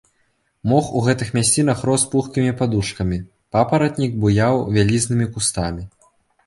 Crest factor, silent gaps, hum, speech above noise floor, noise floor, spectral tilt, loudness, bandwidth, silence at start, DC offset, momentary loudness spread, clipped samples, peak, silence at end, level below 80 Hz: 16 dB; none; none; 47 dB; -65 dBFS; -5 dB/octave; -19 LUFS; 11.5 kHz; 0.65 s; under 0.1%; 8 LU; under 0.1%; -2 dBFS; 0.6 s; -40 dBFS